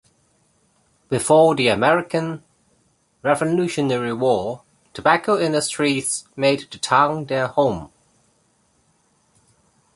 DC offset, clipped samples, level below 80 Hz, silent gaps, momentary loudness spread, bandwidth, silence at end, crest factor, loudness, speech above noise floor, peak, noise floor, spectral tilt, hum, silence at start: under 0.1%; under 0.1%; -56 dBFS; none; 11 LU; 12 kHz; 2.1 s; 20 dB; -19 LUFS; 44 dB; -2 dBFS; -63 dBFS; -4.5 dB/octave; none; 1.1 s